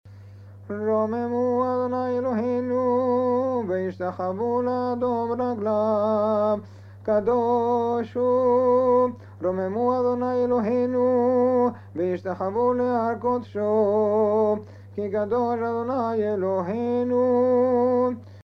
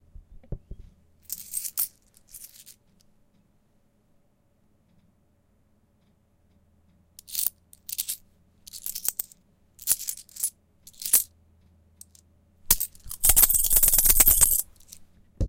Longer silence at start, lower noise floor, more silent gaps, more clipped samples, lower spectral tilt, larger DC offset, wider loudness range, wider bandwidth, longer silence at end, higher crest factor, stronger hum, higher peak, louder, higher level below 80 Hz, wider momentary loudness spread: second, 0.05 s vs 0.5 s; second, -44 dBFS vs -65 dBFS; neither; neither; first, -9 dB/octave vs -0.5 dB/octave; neither; second, 2 LU vs 16 LU; second, 6 kHz vs 17 kHz; about the same, 0 s vs 0 s; second, 12 dB vs 26 dB; neither; second, -10 dBFS vs -2 dBFS; about the same, -23 LUFS vs -22 LUFS; second, -66 dBFS vs -38 dBFS; second, 7 LU vs 27 LU